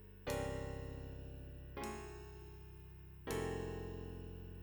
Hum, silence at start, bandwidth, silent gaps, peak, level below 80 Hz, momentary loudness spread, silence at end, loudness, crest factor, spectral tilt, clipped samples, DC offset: none; 0 s; over 20 kHz; none; -28 dBFS; -54 dBFS; 13 LU; 0 s; -47 LUFS; 18 dB; -5.5 dB/octave; under 0.1%; under 0.1%